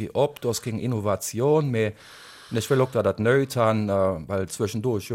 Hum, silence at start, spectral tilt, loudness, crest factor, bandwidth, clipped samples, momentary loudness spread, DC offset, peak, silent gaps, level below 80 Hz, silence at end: none; 0 s; -6 dB/octave; -24 LUFS; 16 dB; 16.5 kHz; under 0.1%; 8 LU; under 0.1%; -8 dBFS; none; -58 dBFS; 0 s